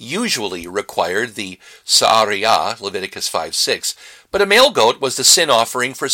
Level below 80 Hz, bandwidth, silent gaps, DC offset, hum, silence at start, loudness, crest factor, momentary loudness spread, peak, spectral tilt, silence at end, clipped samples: -56 dBFS; 17 kHz; none; under 0.1%; none; 0 s; -15 LUFS; 16 dB; 14 LU; 0 dBFS; -1 dB/octave; 0 s; under 0.1%